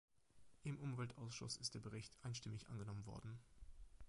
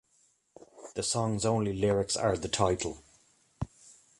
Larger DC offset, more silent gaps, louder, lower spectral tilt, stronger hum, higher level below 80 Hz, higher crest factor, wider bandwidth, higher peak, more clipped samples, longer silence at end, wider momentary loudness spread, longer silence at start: neither; neither; second, -51 LUFS vs -31 LUFS; about the same, -4.5 dB/octave vs -4.5 dB/octave; neither; second, -68 dBFS vs -52 dBFS; about the same, 20 dB vs 22 dB; about the same, 11 kHz vs 11.5 kHz; second, -32 dBFS vs -12 dBFS; neither; second, 0 s vs 0.3 s; about the same, 12 LU vs 14 LU; second, 0.35 s vs 0.6 s